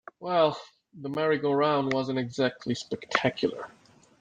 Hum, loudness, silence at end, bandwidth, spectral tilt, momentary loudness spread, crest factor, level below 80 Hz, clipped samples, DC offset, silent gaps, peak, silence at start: none; -28 LUFS; 0.55 s; 9.4 kHz; -5.5 dB/octave; 13 LU; 24 dB; -68 dBFS; under 0.1%; under 0.1%; none; -6 dBFS; 0.2 s